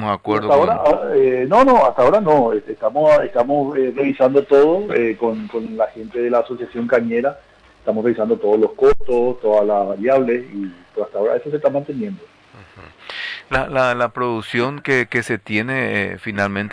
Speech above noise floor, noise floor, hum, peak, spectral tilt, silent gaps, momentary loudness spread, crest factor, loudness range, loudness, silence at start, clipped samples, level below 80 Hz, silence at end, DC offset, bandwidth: 27 dB; -44 dBFS; none; -4 dBFS; -6.5 dB/octave; none; 12 LU; 14 dB; 7 LU; -17 LUFS; 0 s; under 0.1%; -44 dBFS; 0 s; under 0.1%; 10.5 kHz